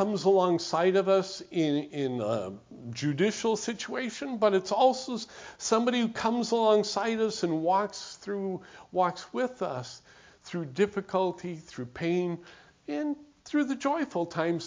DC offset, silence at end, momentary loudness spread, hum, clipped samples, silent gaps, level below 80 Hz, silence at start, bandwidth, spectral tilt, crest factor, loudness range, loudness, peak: under 0.1%; 0 s; 15 LU; none; under 0.1%; none; -68 dBFS; 0 s; 7.6 kHz; -5 dB/octave; 18 dB; 5 LU; -29 LUFS; -10 dBFS